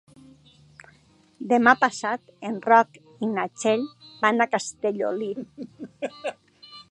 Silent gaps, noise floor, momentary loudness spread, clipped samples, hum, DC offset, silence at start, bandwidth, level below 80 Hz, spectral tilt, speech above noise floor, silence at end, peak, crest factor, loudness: none; -58 dBFS; 17 LU; under 0.1%; none; under 0.1%; 1.4 s; 11 kHz; -72 dBFS; -4 dB/octave; 34 dB; 0.1 s; -2 dBFS; 24 dB; -24 LUFS